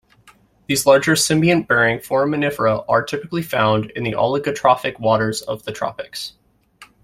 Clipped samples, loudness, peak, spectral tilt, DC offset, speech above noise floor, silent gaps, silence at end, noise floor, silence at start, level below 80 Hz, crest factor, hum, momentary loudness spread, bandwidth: under 0.1%; -18 LUFS; -2 dBFS; -4.5 dB/octave; under 0.1%; 34 dB; none; 0.2 s; -52 dBFS; 0.7 s; -52 dBFS; 18 dB; none; 12 LU; 16 kHz